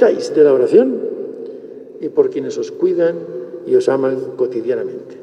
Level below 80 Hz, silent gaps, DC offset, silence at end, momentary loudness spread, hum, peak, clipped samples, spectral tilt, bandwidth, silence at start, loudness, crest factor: -72 dBFS; none; under 0.1%; 0 s; 16 LU; none; 0 dBFS; under 0.1%; -6.5 dB/octave; 9.8 kHz; 0 s; -16 LUFS; 16 dB